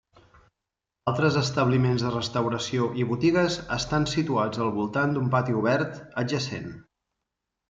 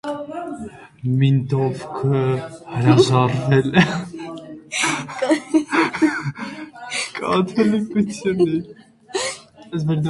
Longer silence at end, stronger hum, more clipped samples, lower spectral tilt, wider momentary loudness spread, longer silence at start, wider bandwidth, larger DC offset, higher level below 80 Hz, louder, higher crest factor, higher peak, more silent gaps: first, 0.85 s vs 0 s; neither; neither; about the same, -6 dB/octave vs -6 dB/octave; second, 7 LU vs 15 LU; first, 1.05 s vs 0.05 s; second, 7.8 kHz vs 11.5 kHz; neither; about the same, -54 dBFS vs -54 dBFS; second, -25 LUFS vs -20 LUFS; about the same, 18 dB vs 20 dB; second, -8 dBFS vs 0 dBFS; neither